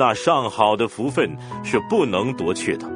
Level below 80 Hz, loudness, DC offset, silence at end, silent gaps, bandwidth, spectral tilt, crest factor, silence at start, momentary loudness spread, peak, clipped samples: -56 dBFS; -21 LUFS; under 0.1%; 0 s; none; 10.5 kHz; -5 dB/octave; 18 dB; 0 s; 6 LU; -2 dBFS; under 0.1%